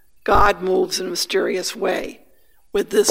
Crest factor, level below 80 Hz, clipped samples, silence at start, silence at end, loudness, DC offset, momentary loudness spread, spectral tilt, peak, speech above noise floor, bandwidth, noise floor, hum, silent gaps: 18 dB; -36 dBFS; under 0.1%; 0 s; 0 s; -20 LUFS; under 0.1%; 10 LU; -3 dB/octave; -2 dBFS; 41 dB; 16 kHz; -59 dBFS; none; none